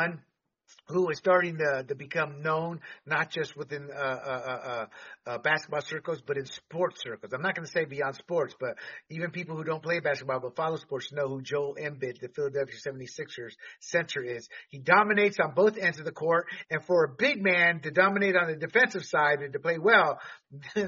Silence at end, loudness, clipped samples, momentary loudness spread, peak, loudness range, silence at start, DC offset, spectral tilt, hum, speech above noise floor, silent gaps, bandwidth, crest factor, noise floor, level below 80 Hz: 0 s; -28 LUFS; under 0.1%; 15 LU; -8 dBFS; 8 LU; 0 s; under 0.1%; -3 dB/octave; none; 40 dB; none; 7.2 kHz; 22 dB; -69 dBFS; -74 dBFS